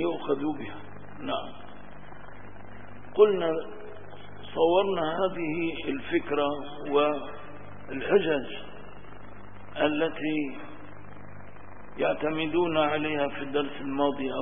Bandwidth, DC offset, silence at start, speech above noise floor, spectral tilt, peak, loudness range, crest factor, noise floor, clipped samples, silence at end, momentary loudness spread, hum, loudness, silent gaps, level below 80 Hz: 3.7 kHz; 1%; 0 s; 20 dB; -9.5 dB/octave; -8 dBFS; 5 LU; 22 dB; -47 dBFS; under 0.1%; 0 s; 23 LU; 50 Hz at -55 dBFS; -28 LUFS; none; -58 dBFS